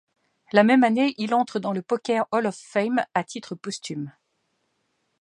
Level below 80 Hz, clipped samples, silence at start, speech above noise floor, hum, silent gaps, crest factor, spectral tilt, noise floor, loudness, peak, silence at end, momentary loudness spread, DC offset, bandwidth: -76 dBFS; under 0.1%; 0.55 s; 50 dB; none; none; 22 dB; -5.5 dB/octave; -73 dBFS; -23 LUFS; -2 dBFS; 1.1 s; 16 LU; under 0.1%; 10.5 kHz